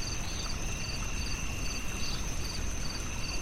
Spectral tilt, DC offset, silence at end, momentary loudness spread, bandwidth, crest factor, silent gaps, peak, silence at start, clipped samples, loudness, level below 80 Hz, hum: -3 dB/octave; under 0.1%; 0 s; 1 LU; 16 kHz; 12 dB; none; -20 dBFS; 0 s; under 0.1%; -36 LUFS; -38 dBFS; none